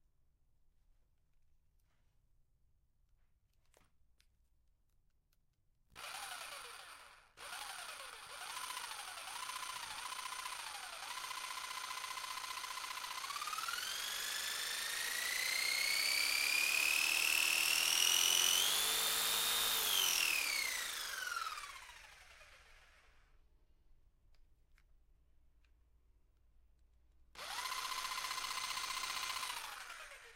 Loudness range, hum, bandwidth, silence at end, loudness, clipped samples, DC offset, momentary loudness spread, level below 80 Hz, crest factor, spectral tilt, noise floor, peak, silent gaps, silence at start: 19 LU; none; 16 kHz; 0 s; -36 LUFS; under 0.1%; under 0.1%; 17 LU; -72 dBFS; 24 dB; 2.5 dB/octave; -76 dBFS; -16 dBFS; none; 5.95 s